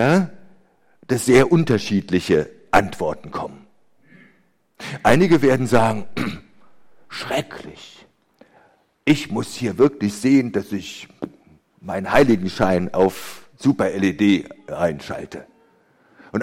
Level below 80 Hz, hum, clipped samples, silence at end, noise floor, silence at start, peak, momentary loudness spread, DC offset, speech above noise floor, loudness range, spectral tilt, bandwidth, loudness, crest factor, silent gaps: -46 dBFS; none; under 0.1%; 0 s; -61 dBFS; 0 s; 0 dBFS; 19 LU; under 0.1%; 42 dB; 5 LU; -6 dB/octave; 16.5 kHz; -19 LUFS; 20 dB; none